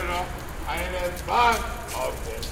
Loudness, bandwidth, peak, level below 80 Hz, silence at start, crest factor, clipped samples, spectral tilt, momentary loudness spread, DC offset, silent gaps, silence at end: -26 LUFS; 18 kHz; -8 dBFS; -36 dBFS; 0 s; 20 dB; under 0.1%; -3.5 dB/octave; 12 LU; under 0.1%; none; 0 s